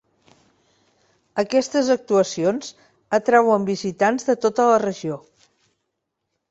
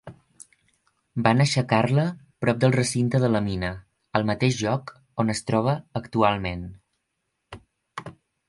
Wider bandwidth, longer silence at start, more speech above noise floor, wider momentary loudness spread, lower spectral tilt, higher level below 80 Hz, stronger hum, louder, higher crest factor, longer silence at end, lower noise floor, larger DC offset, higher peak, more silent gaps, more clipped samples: second, 8.2 kHz vs 11.5 kHz; first, 1.35 s vs 0.05 s; about the same, 58 dB vs 55 dB; second, 14 LU vs 18 LU; about the same, -5 dB/octave vs -6 dB/octave; second, -66 dBFS vs -50 dBFS; neither; first, -20 LUFS vs -24 LUFS; about the same, 20 dB vs 22 dB; first, 1.3 s vs 0.4 s; about the same, -78 dBFS vs -78 dBFS; neither; about the same, -2 dBFS vs -4 dBFS; neither; neither